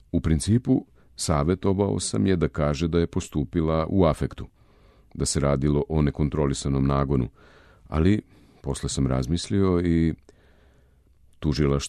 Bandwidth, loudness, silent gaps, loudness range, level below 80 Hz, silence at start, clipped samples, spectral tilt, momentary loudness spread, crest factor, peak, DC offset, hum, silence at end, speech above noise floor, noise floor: 13 kHz; -24 LUFS; none; 2 LU; -36 dBFS; 0.15 s; under 0.1%; -6.5 dB/octave; 9 LU; 18 dB; -8 dBFS; under 0.1%; none; 0 s; 35 dB; -58 dBFS